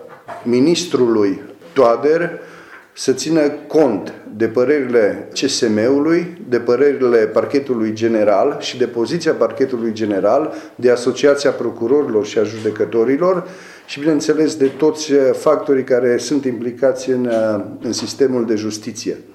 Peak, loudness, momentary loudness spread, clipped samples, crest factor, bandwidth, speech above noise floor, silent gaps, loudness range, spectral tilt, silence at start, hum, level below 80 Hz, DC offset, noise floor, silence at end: -2 dBFS; -16 LUFS; 8 LU; under 0.1%; 14 dB; 13 kHz; 24 dB; none; 2 LU; -5 dB/octave; 0 s; none; -64 dBFS; under 0.1%; -39 dBFS; 0.15 s